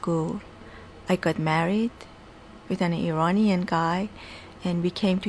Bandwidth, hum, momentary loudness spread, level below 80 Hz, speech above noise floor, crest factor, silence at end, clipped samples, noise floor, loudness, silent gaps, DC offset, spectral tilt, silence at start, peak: 11 kHz; none; 21 LU; -54 dBFS; 22 dB; 16 dB; 0 s; under 0.1%; -47 dBFS; -26 LUFS; none; under 0.1%; -7 dB/octave; 0 s; -10 dBFS